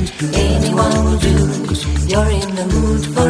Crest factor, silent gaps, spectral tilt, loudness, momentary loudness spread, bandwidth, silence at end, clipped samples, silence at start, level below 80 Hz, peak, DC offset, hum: 14 dB; none; -5.5 dB/octave; -16 LUFS; 4 LU; 11 kHz; 0 s; under 0.1%; 0 s; -20 dBFS; 0 dBFS; under 0.1%; none